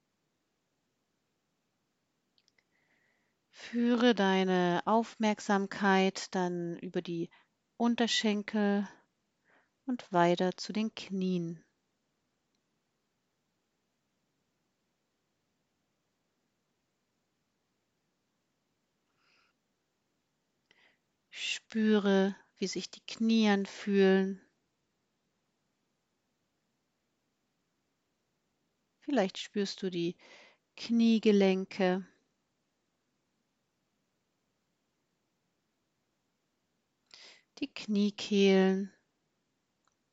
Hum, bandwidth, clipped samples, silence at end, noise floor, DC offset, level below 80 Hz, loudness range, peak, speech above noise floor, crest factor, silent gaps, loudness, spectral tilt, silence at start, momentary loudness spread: none; 8 kHz; under 0.1%; 1.25 s; -81 dBFS; under 0.1%; -86 dBFS; 10 LU; -12 dBFS; 51 dB; 22 dB; none; -30 LUFS; -5.5 dB/octave; 3.6 s; 14 LU